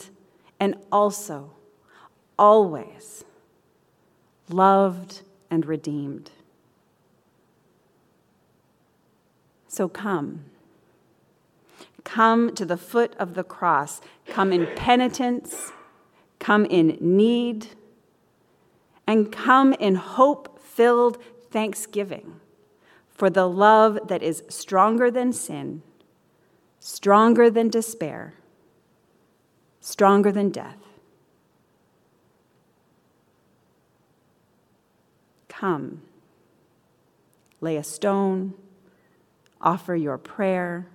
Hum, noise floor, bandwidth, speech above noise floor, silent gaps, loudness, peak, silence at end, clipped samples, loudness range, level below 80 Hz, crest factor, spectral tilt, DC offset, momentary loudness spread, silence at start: none; -64 dBFS; 16 kHz; 43 dB; none; -21 LUFS; -2 dBFS; 0.1 s; under 0.1%; 13 LU; -66 dBFS; 22 dB; -5.5 dB/octave; under 0.1%; 19 LU; 0 s